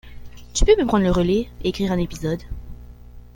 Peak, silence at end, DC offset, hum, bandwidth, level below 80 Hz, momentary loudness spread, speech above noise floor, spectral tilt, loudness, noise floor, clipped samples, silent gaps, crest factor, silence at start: -2 dBFS; 0.1 s; under 0.1%; 60 Hz at -40 dBFS; 16.5 kHz; -30 dBFS; 13 LU; 22 dB; -5.5 dB/octave; -21 LUFS; -41 dBFS; under 0.1%; none; 18 dB; 0.05 s